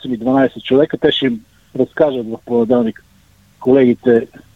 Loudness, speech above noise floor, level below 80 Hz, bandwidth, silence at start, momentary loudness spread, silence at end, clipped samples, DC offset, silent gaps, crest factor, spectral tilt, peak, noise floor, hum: -15 LUFS; 36 dB; -52 dBFS; 6.8 kHz; 0.05 s; 10 LU; 0.3 s; under 0.1%; 0.1%; none; 14 dB; -7.5 dB/octave; 0 dBFS; -50 dBFS; none